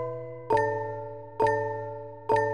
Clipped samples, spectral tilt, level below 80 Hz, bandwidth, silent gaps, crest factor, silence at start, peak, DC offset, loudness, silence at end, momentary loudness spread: under 0.1%; -6.5 dB/octave; -58 dBFS; 10 kHz; none; 16 dB; 0 s; -12 dBFS; 0.2%; -29 LUFS; 0 s; 12 LU